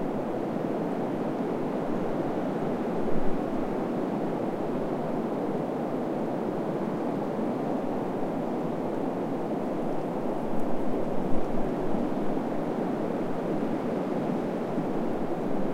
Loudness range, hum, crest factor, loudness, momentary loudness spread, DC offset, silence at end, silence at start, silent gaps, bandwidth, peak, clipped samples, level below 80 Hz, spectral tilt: 1 LU; none; 16 dB; -30 LUFS; 1 LU; 0.4%; 0 s; 0 s; none; 12.5 kHz; -10 dBFS; under 0.1%; -46 dBFS; -8 dB/octave